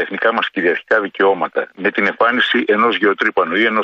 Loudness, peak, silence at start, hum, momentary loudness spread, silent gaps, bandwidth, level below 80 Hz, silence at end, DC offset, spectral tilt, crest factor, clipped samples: -15 LUFS; -2 dBFS; 0 s; none; 5 LU; none; 7.4 kHz; -64 dBFS; 0 s; under 0.1%; -5.5 dB/octave; 14 dB; under 0.1%